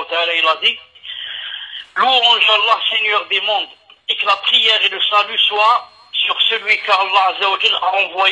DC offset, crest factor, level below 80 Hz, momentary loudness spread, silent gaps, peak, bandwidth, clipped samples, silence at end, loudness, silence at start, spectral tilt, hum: under 0.1%; 16 dB; -72 dBFS; 15 LU; none; 0 dBFS; 10.5 kHz; under 0.1%; 0 s; -13 LUFS; 0 s; 0.5 dB/octave; none